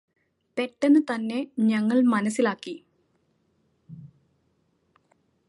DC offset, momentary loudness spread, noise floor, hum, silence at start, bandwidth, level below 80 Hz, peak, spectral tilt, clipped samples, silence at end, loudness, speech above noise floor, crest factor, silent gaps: under 0.1%; 22 LU; -70 dBFS; none; 0.55 s; 11.5 kHz; -76 dBFS; -10 dBFS; -6 dB/octave; under 0.1%; 1.4 s; -24 LUFS; 47 dB; 16 dB; none